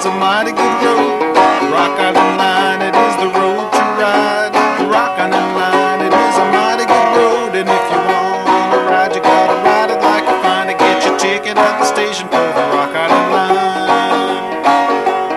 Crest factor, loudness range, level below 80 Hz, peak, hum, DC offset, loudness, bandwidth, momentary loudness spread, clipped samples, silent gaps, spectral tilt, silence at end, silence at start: 12 dB; 1 LU; -56 dBFS; 0 dBFS; none; under 0.1%; -12 LUFS; 13 kHz; 3 LU; under 0.1%; none; -3.5 dB/octave; 0 s; 0 s